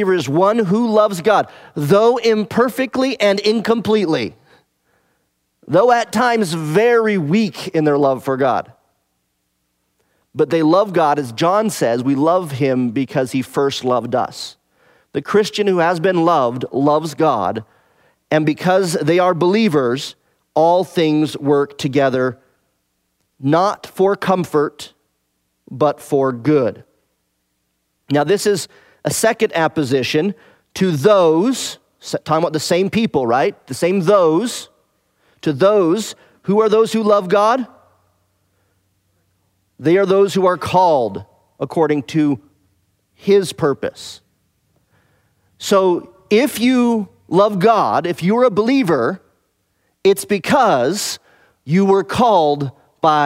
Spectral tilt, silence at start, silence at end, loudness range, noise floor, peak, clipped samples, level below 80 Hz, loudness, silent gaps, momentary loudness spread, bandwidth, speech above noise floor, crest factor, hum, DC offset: -5.5 dB/octave; 0 s; 0 s; 4 LU; -69 dBFS; 0 dBFS; under 0.1%; -60 dBFS; -16 LUFS; none; 11 LU; 16 kHz; 53 dB; 16 dB; none; under 0.1%